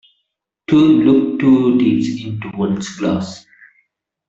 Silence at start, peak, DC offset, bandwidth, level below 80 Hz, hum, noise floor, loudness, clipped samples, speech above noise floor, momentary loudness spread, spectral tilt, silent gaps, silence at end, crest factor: 0.7 s; -2 dBFS; under 0.1%; 8 kHz; -52 dBFS; none; -74 dBFS; -15 LUFS; under 0.1%; 59 dB; 14 LU; -7 dB/octave; none; 0.9 s; 14 dB